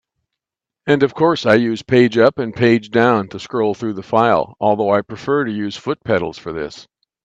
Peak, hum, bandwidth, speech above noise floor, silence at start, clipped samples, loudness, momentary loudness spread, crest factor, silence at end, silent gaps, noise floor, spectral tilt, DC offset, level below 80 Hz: 0 dBFS; none; 8 kHz; 69 dB; 0.85 s; under 0.1%; -17 LUFS; 10 LU; 16 dB; 0.4 s; none; -86 dBFS; -6.5 dB/octave; under 0.1%; -56 dBFS